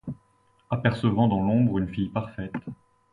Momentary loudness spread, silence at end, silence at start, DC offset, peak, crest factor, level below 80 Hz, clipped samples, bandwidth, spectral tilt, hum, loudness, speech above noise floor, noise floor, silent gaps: 16 LU; 0.4 s; 0.05 s; under 0.1%; -8 dBFS; 20 dB; -50 dBFS; under 0.1%; 10 kHz; -9 dB/octave; none; -25 LUFS; 40 dB; -64 dBFS; none